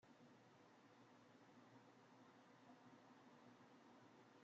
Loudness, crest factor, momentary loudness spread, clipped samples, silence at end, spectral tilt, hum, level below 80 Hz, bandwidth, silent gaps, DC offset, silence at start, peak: -69 LUFS; 14 dB; 2 LU; under 0.1%; 0 s; -4 dB/octave; none; under -90 dBFS; 7.4 kHz; none; under 0.1%; 0 s; -54 dBFS